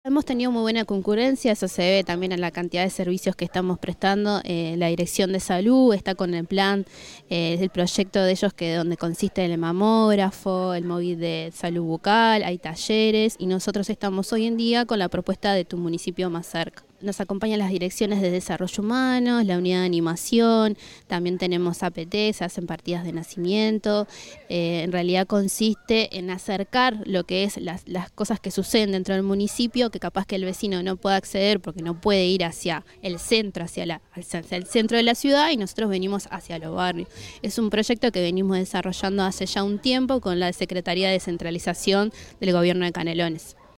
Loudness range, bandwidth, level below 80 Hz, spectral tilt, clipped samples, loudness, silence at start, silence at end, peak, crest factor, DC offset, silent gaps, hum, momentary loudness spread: 3 LU; 16.5 kHz; -54 dBFS; -5 dB/octave; under 0.1%; -24 LUFS; 0.05 s; 0.3 s; -6 dBFS; 16 dB; under 0.1%; none; none; 10 LU